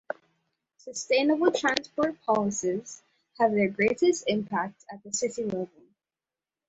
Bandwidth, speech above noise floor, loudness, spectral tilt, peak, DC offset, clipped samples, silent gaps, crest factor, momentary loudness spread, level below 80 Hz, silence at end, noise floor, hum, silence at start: 8.2 kHz; over 63 dB; -27 LUFS; -4 dB/octave; -2 dBFS; under 0.1%; under 0.1%; none; 26 dB; 16 LU; -68 dBFS; 1 s; under -90 dBFS; none; 0.85 s